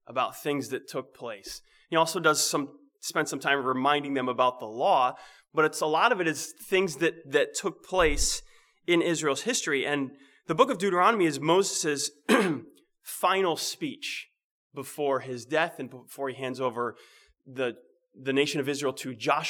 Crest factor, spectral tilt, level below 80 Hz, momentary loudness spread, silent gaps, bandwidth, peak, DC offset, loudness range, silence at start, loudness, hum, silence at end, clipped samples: 22 dB; -3 dB/octave; -48 dBFS; 14 LU; 14.44-14.70 s; 20 kHz; -6 dBFS; under 0.1%; 7 LU; 0.1 s; -27 LUFS; none; 0 s; under 0.1%